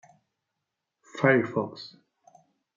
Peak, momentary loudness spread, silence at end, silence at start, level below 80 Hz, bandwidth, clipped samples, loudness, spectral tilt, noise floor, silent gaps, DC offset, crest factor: -8 dBFS; 22 LU; 0.9 s; 1.15 s; -78 dBFS; 7.6 kHz; under 0.1%; -25 LUFS; -7 dB/octave; -84 dBFS; none; under 0.1%; 22 dB